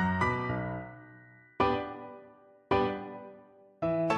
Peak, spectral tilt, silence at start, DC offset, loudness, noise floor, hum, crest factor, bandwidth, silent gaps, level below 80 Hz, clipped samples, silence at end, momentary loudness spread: -14 dBFS; -7 dB/octave; 0 s; under 0.1%; -32 LUFS; -57 dBFS; none; 20 dB; 11 kHz; none; -52 dBFS; under 0.1%; 0 s; 21 LU